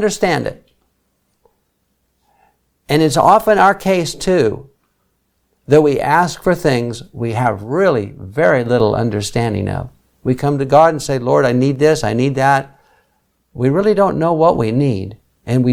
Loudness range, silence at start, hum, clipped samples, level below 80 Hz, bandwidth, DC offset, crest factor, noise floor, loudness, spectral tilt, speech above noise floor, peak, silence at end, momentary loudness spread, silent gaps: 2 LU; 0 s; none; under 0.1%; -44 dBFS; 18.5 kHz; under 0.1%; 16 dB; -65 dBFS; -15 LUFS; -6 dB/octave; 51 dB; 0 dBFS; 0 s; 11 LU; none